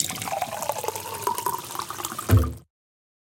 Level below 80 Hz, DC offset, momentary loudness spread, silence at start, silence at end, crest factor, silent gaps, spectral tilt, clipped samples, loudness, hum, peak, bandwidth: -38 dBFS; under 0.1%; 9 LU; 0 s; 0.65 s; 24 dB; none; -4.5 dB/octave; under 0.1%; -27 LUFS; none; -4 dBFS; 17 kHz